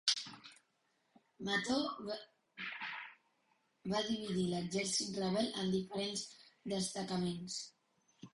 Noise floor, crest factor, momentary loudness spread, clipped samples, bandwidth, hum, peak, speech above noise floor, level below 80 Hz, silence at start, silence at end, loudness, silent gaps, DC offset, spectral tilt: -79 dBFS; 24 dB; 15 LU; under 0.1%; 11.5 kHz; none; -16 dBFS; 41 dB; -72 dBFS; 0.05 s; 0.05 s; -39 LUFS; none; under 0.1%; -3.5 dB/octave